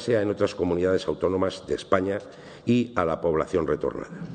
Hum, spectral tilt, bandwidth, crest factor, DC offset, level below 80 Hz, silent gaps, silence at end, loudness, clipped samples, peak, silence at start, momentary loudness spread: none; -6.5 dB/octave; 9.4 kHz; 20 dB; under 0.1%; -52 dBFS; none; 0 s; -26 LUFS; under 0.1%; -6 dBFS; 0 s; 8 LU